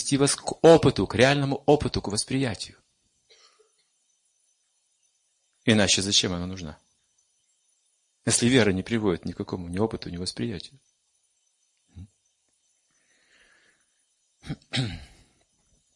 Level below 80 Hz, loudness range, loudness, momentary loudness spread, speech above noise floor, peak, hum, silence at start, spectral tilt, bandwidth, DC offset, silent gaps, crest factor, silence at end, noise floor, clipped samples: -52 dBFS; 16 LU; -24 LUFS; 18 LU; 48 dB; -4 dBFS; none; 0 s; -4 dB/octave; 11.5 kHz; under 0.1%; none; 24 dB; 0.9 s; -72 dBFS; under 0.1%